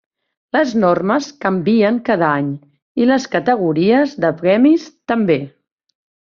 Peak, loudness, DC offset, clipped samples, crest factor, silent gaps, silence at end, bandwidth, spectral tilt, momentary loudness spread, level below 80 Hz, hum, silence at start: -2 dBFS; -16 LUFS; under 0.1%; under 0.1%; 14 dB; 2.82-2.95 s; 0.9 s; 7.2 kHz; -6.5 dB/octave; 7 LU; -58 dBFS; none; 0.55 s